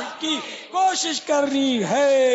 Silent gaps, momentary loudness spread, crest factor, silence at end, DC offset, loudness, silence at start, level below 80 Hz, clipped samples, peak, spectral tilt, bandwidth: none; 7 LU; 12 dB; 0 s; under 0.1%; -21 LUFS; 0 s; -68 dBFS; under 0.1%; -8 dBFS; -3 dB/octave; 8 kHz